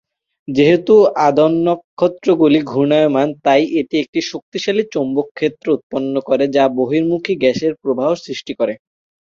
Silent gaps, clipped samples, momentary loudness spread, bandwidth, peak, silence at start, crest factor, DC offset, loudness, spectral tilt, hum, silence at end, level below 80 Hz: 1.84-1.97 s, 4.08-4.13 s, 4.42-4.52 s, 5.31-5.35 s, 5.83-5.90 s; under 0.1%; 9 LU; 7.4 kHz; 0 dBFS; 0.5 s; 14 dB; under 0.1%; -16 LUFS; -6 dB/octave; none; 0.5 s; -58 dBFS